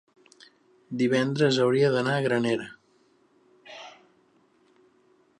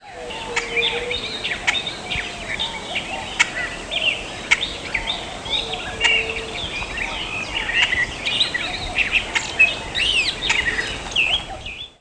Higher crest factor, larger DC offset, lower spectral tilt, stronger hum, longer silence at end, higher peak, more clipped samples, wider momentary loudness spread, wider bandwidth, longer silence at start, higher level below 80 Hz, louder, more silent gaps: about the same, 20 dB vs 20 dB; neither; first, -6 dB/octave vs -1.5 dB/octave; neither; first, 1.5 s vs 0.1 s; second, -8 dBFS vs -2 dBFS; neither; first, 22 LU vs 9 LU; about the same, 11 kHz vs 11 kHz; first, 0.9 s vs 0 s; second, -74 dBFS vs -40 dBFS; second, -24 LUFS vs -20 LUFS; neither